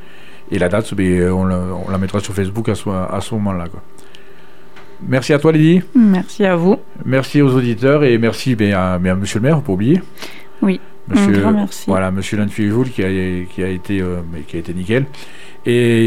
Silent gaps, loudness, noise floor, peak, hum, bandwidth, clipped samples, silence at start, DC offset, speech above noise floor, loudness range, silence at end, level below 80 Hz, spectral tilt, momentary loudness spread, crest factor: none; -16 LUFS; -43 dBFS; 0 dBFS; none; 15 kHz; under 0.1%; 0.25 s; 4%; 28 dB; 6 LU; 0 s; -46 dBFS; -7 dB/octave; 12 LU; 16 dB